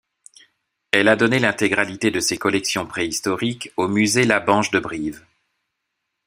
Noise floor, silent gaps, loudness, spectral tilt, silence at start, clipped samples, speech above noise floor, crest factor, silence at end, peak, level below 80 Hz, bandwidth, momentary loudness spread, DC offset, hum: -78 dBFS; none; -19 LUFS; -3.5 dB/octave; 0.95 s; under 0.1%; 58 dB; 22 dB; 1.1 s; 0 dBFS; -58 dBFS; 16 kHz; 8 LU; under 0.1%; none